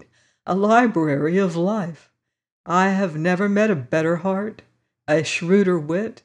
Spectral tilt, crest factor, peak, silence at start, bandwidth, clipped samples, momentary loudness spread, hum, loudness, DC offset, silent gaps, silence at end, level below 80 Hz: -6.5 dB/octave; 16 dB; -4 dBFS; 0.45 s; 10 kHz; under 0.1%; 10 LU; none; -20 LUFS; under 0.1%; 2.52-2.64 s; 0.1 s; -68 dBFS